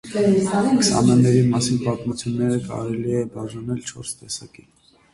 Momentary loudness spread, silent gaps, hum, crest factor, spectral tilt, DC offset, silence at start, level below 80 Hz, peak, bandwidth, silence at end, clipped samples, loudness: 15 LU; none; none; 16 dB; -5.5 dB/octave; under 0.1%; 0.05 s; -50 dBFS; -4 dBFS; 11.5 kHz; 0.7 s; under 0.1%; -20 LUFS